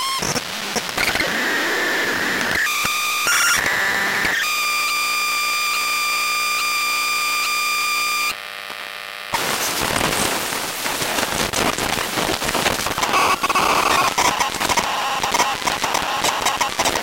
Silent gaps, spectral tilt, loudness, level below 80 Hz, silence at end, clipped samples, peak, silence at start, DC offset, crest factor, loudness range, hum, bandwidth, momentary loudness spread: none; -1 dB/octave; -18 LUFS; -46 dBFS; 0 s; under 0.1%; -2 dBFS; 0 s; under 0.1%; 18 dB; 3 LU; 60 Hz at -55 dBFS; 17 kHz; 5 LU